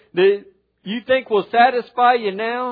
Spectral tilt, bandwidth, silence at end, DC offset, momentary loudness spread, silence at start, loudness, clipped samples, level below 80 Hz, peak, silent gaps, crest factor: -8 dB/octave; 4.9 kHz; 0 s; under 0.1%; 13 LU; 0.15 s; -18 LUFS; under 0.1%; -66 dBFS; -2 dBFS; none; 18 dB